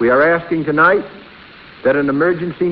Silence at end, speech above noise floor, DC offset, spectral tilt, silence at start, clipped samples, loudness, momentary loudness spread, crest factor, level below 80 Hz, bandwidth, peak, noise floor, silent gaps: 0 s; 25 dB; under 0.1%; -10 dB/octave; 0 s; under 0.1%; -15 LUFS; 7 LU; 16 dB; -50 dBFS; 5.4 kHz; 0 dBFS; -40 dBFS; none